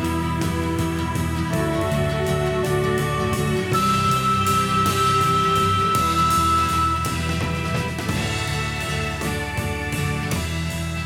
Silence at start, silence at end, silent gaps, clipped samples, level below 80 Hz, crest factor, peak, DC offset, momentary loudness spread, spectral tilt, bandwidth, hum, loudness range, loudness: 0 s; 0 s; none; under 0.1%; -36 dBFS; 14 dB; -8 dBFS; under 0.1%; 6 LU; -5 dB/octave; 19 kHz; none; 6 LU; -21 LUFS